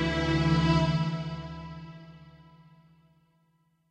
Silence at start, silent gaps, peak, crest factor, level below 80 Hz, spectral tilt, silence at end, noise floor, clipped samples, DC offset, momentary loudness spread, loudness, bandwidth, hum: 0 s; none; -12 dBFS; 18 dB; -44 dBFS; -7 dB/octave; 1.55 s; -70 dBFS; under 0.1%; under 0.1%; 23 LU; -27 LUFS; 8.4 kHz; none